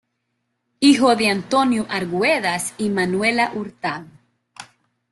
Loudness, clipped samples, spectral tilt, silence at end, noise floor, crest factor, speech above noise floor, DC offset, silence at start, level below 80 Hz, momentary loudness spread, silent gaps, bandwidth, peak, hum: -19 LUFS; under 0.1%; -4 dB/octave; 0.5 s; -74 dBFS; 18 dB; 54 dB; under 0.1%; 0.8 s; -60 dBFS; 12 LU; none; 12.5 kHz; -2 dBFS; none